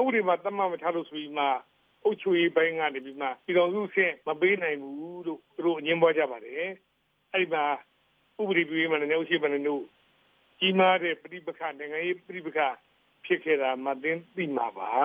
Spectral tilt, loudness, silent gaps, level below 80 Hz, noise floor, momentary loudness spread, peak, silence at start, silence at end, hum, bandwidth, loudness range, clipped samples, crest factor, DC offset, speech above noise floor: -7.5 dB/octave; -28 LUFS; none; -86 dBFS; -65 dBFS; 12 LU; -10 dBFS; 0 s; 0 s; none; 4.9 kHz; 3 LU; under 0.1%; 18 dB; under 0.1%; 38 dB